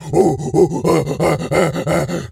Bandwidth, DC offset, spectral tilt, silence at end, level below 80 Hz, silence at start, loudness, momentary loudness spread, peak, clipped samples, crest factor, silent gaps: 16 kHz; under 0.1%; -6.5 dB/octave; 0.05 s; -42 dBFS; 0 s; -16 LUFS; 4 LU; 0 dBFS; under 0.1%; 16 dB; none